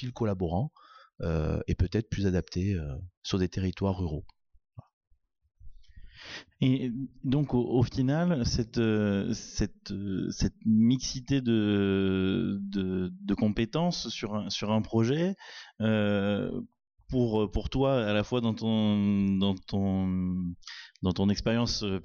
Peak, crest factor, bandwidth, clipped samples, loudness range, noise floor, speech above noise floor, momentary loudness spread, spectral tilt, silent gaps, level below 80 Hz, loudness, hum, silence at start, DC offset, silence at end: -16 dBFS; 12 dB; 7.2 kHz; under 0.1%; 6 LU; -49 dBFS; 20 dB; 9 LU; -6.5 dB/octave; 3.17-3.22 s, 4.93-5.01 s, 5.07-5.11 s; -46 dBFS; -29 LUFS; none; 0 s; under 0.1%; 0 s